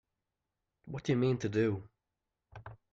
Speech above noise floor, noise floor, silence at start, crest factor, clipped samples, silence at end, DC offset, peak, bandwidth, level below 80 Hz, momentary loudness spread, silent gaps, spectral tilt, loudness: 55 dB; -88 dBFS; 0.85 s; 16 dB; under 0.1%; 0.15 s; under 0.1%; -20 dBFS; 7.8 kHz; -66 dBFS; 21 LU; none; -7.5 dB/octave; -33 LUFS